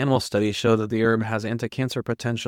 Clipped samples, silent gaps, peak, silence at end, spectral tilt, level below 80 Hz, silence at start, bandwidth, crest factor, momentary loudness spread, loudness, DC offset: under 0.1%; none; -8 dBFS; 0 s; -6 dB/octave; -56 dBFS; 0 s; 16.5 kHz; 16 dB; 6 LU; -24 LUFS; under 0.1%